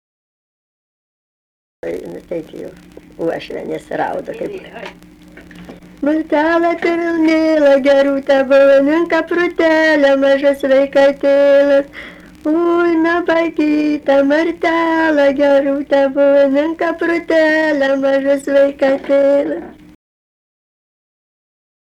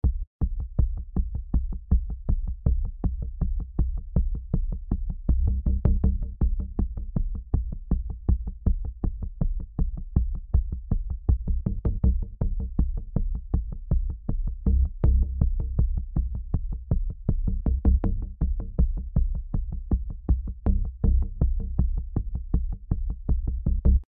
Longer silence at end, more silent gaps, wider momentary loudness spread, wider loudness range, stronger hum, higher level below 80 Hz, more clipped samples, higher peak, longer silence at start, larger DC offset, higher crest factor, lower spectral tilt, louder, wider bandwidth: first, 2.1 s vs 0.05 s; second, none vs 0.27-0.39 s; first, 15 LU vs 7 LU; first, 13 LU vs 2 LU; neither; second, -50 dBFS vs -26 dBFS; neither; about the same, -6 dBFS vs -6 dBFS; first, 1.85 s vs 0.05 s; neither; second, 10 dB vs 18 dB; second, -5 dB/octave vs -14.5 dB/octave; first, -13 LUFS vs -29 LUFS; first, 10.5 kHz vs 1.8 kHz